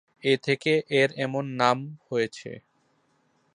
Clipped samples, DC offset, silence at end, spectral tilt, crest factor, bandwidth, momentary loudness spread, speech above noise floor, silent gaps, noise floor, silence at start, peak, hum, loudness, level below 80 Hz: under 0.1%; under 0.1%; 0.95 s; -5.5 dB/octave; 22 dB; 10.5 kHz; 13 LU; 43 dB; none; -68 dBFS; 0.25 s; -4 dBFS; none; -25 LUFS; -72 dBFS